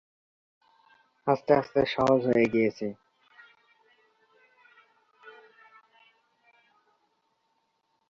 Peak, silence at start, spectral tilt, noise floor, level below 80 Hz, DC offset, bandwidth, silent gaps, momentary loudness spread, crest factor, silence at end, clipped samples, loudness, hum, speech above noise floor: -8 dBFS; 1.25 s; -7 dB/octave; -75 dBFS; -64 dBFS; under 0.1%; 7.6 kHz; none; 12 LU; 24 dB; 2.8 s; under 0.1%; -26 LUFS; none; 50 dB